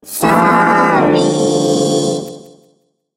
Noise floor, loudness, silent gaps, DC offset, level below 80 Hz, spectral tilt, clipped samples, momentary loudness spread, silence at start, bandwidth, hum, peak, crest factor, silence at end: -58 dBFS; -12 LUFS; none; under 0.1%; -50 dBFS; -5 dB/octave; under 0.1%; 8 LU; 0.05 s; 16 kHz; none; 0 dBFS; 14 dB; 0.75 s